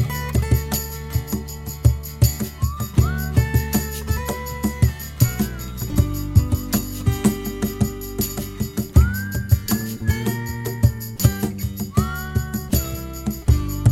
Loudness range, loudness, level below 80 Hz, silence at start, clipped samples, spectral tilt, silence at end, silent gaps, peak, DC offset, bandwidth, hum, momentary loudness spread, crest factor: 1 LU; -22 LUFS; -28 dBFS; 0 s; under 0.1%; -5.5 dB/octave; 0 s; none; 0 dBFS; under 0.1%; 16.5 kHz; none; 7 LU; 20 dB